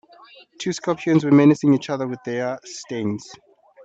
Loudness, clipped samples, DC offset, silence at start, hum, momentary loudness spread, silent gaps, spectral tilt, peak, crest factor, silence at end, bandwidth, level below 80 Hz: -20 LUFS; under 0.1%; under 0.1%; 0.6 s; none; 16 LU; none; -6.5 dB/octave; -4 dBFS; 18 dB; 0.5 s; 8 kHz; -68 dBFS